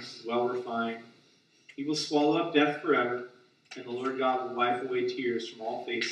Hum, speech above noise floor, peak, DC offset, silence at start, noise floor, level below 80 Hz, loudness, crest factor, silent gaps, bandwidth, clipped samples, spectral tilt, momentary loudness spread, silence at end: none; 34 dB; -10 dBFS; under 0.1%; 0 s; -64 dBFS; -84 dBFS; -30 LUFS; 22 dB; none; 10.5 kHz; under 0.1%; -4.5 dB/octave; 13 LU; 0 s